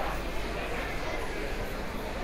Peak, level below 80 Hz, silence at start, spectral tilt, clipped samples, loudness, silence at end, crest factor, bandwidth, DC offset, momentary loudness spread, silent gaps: -20 dBFS; -38 dBFS; 0 s; -4.5 dB/octave; under 0.1%; -35 LUFS; 0 s; 12 dB; 16 kHz; under 0.1%; 2 LU; none